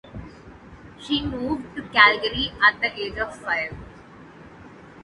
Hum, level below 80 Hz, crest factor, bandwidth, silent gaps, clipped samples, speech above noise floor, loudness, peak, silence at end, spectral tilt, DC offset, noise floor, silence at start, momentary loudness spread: none; -46 dBFS; 24 dB; 11.5 kHz; none; under 0.1%; 23 dB; -21 LUFS; -2 dBFS; 0 s; -4.5 dB/octave; under 0.1%; -45 dBFS; 0.05 s; 24 LU